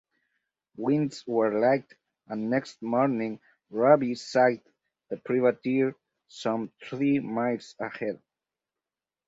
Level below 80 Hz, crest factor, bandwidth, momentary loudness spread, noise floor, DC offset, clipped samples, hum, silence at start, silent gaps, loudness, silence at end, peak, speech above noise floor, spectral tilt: -74 dBFS; 22 dB; 8 kHz; 14 LU; under -90 dBFS; under 0.1%; under 0.1%; none; 0.8 s; none; -27 LUFS; 1.1 s; -6 dBFS; over 64 dB; -6.5 dB/octave